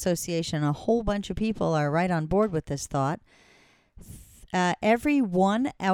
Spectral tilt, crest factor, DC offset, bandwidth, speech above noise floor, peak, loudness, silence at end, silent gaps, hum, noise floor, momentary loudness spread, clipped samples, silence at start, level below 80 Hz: -6 dB/octave; 16 dB; under 0.1%; 17.5 kHz; 34 dB; -10 dBFS; -26 LUFS; 0 s; none; none; -60 dBFS; 7 LU; under 0.1%; 0 s; -46 dBFS